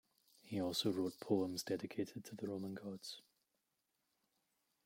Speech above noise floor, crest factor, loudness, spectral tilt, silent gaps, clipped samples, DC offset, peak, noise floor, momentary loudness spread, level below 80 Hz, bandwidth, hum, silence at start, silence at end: 45 dB; 22 dB; -42 LUFS; -5 dB/octave; none; under 0.1%; under 0.1%; -24 dBFS; -86 dBFS; 11 LU; -84 dBFS; 16.5 kHz; none; 0.45 s; 1.65 s